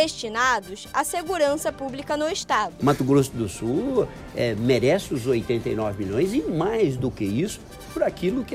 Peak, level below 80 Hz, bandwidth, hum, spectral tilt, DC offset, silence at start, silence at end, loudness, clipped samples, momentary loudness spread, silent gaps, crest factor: -6 dBFS; -48 dBFS; 16 kHz; none; -5 dB/octave; under 0.1%; 0 s; 0 s; -24 LUFS; under 0.1%; 7 LU; none; 16 dB